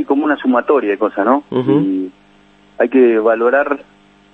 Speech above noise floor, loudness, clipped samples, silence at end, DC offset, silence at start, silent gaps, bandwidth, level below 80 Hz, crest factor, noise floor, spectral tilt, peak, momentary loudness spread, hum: 35 dB; -15 LUFS; under 0.1%; 0.5 s; under 0.1%; 0 s; none; 4.1 kHz; -60 dBFS; 14 dB; -48 dBFS; -9 dB/octave; 0 dBFS; 9 LU; 50 Hz at -50 dBFS